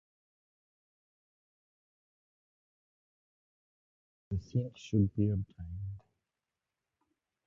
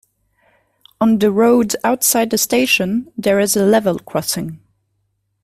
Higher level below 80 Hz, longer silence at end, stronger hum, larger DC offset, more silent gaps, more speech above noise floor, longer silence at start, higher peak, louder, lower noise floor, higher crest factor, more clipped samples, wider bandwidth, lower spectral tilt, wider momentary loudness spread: about the same, -54 dBFS vs -54 dBFS; first, 1.45 s vs 0.9 s; neither; neither; neither; first, 57 dB vs 53 dB; first, 4.3 s vs 1 s; second, -18 dBFS vs 0 dBFS; second, -35 LUFS vs -15 LUFS; first, -90 dBFS vs -68 dBFS; first, 22 dB vs 16 dB; neither; second, 7.2 kHz vs 16 kHz; first, -9 dB/octave vs -3.5 dB/octave; first, 13 LU vs 8 LU